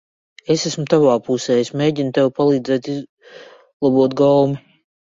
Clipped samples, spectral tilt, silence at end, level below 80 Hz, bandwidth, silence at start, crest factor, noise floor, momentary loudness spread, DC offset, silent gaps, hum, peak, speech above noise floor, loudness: under 0.1%; -6 dB/octave; 0.55 s; -60 dBFS; 7.8 kHz; 0.5 s; 16 dB; -42 dBFS; 8 LU; under 0.1%; 3.09-3.17 s, 3.73-3.80 s; none; -2 dBFS; 26 dB; -17 LUFS